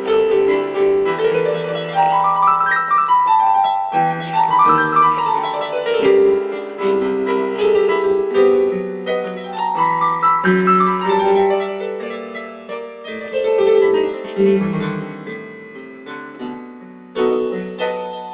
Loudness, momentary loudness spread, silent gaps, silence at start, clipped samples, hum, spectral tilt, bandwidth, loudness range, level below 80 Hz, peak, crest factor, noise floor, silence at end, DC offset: -16 LUFS; 16 LU; none; 0 s; under 0.1%; none; -9.5 dB/octave; 4 kHz; 6 LU; -60 dBFS; -2 dBFS; 14 dB; -37 dBFS; 0 s; under 0.1%